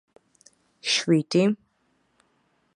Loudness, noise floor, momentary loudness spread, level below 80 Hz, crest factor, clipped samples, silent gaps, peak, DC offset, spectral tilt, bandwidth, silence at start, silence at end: -23 LUFS; -69 dBFS; 12 LU; -76 dBFS; 18 dB; under 0.1%; none; -10 dBFS; under 0.1%; -4.5 dB/octave; 11 kHz; 0.85 s; 1.2 s